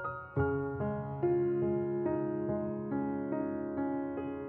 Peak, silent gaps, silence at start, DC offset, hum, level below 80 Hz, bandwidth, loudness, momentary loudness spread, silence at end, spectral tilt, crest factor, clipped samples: -20 dBFS; none; 0 s; under 0.1%; none; -60 dBFS; 3.1 kHz; -34 LUFS; 5 LU; 0 s; -10 dB/octave; 14 dB; under 0.1%